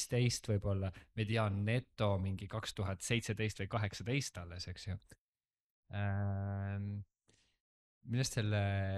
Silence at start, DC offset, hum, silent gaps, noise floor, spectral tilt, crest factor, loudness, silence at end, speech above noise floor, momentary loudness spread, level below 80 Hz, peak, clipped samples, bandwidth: 0 s; under 0.1%; none; 5.18-5.33 s, 5.60-5.83 s, 7.60-8.01 s; under -90 dBFS; -5.5 dB/octave; 20 dB; -38 LUFS; 0 s; over 53 dB; 11 LU; -62 dBFS; -18 dBFS; under 0.1%; 13.5 kHz